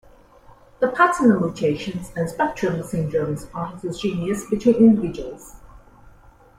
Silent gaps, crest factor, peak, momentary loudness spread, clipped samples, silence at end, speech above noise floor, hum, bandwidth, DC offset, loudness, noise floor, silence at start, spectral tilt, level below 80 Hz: none; 18 dB; -4 dBFS; 14 LU; under 0.1%; 0.5 s; 29 dB; none; 15 kHz; under 0.1%; -21 LUFS; -49 dBFS; 0.8 s; -6.5 dB/octave; -48 dBFS